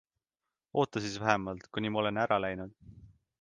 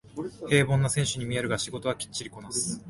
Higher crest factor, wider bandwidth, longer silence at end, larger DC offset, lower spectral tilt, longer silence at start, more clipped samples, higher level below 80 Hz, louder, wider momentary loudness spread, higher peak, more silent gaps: first, 26 dB vs 20 dB; second, 9.8 kHz vs 11.5 kHz; first, 0.35 s vs 0 s; neither; first, -5.5 dB/octave vs -4 dB/octave; first, 0.75 s vs 0.05 s; neither; second, -62 dBFS vs -54 dBFS; second, -32 LUFS vs -28 LUFS; second, 8 LU vs 12 LU; about the same, -8 dBFS vs -8 dBFS; neither